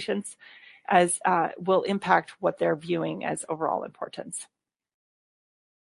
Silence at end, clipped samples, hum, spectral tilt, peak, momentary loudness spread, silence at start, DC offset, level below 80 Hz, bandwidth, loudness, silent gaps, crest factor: 1.45 s; under 0.1%; none; -4.5 dB/octave; -6 dBFS; 14 LU; 0 s; under 0.1%; -72 dBFS; 11.5 kHz; -26 LUFS; none; 22 dB